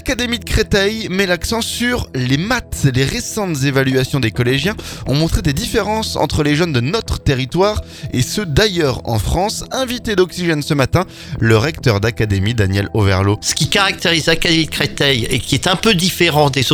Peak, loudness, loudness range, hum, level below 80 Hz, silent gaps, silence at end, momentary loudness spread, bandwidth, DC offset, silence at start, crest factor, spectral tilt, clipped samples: 0 dBFS; -16 LUFS; 3 LU; none; -30 dBFS; none; 0 s; 6 LU; 19.5 kHz; under 0.1%; 0 s; 16 dB; -4.5 dB/octave; under 0.1%